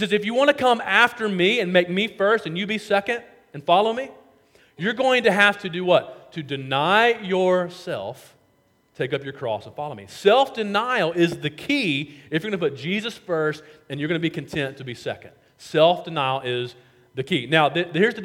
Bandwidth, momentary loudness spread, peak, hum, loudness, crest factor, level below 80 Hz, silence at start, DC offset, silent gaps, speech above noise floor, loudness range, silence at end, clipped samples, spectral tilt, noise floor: 16.5 kHz; 14 LU; -2 dBFS; none; -22 LUFS; 22 dB; -66 dBFS; 0 s; under 0.1%; none; 41 dB; 5 LU; 0 s; under 0.1%; -5 dB/octave; -63 dBFS